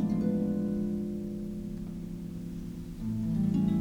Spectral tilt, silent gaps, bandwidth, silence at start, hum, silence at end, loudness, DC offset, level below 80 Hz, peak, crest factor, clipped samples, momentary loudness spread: -9.5 dB/octave; none; 15 kHz; 0 s; none; 0 s; -33 LUFS; under 0.1%; -48 dBFS; -18 dBFS; 14 dB; under 0.1%; 11 LU